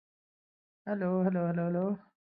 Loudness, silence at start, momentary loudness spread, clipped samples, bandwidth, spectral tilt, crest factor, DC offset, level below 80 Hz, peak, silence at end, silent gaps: -32 LUFS; 0.85 s; 8 LU; under 0.1%; 3 kHz; -13 dB/octave; 18 dB; under 0.1%; -72 dBFS; -16 dBFS; 0.25 s; none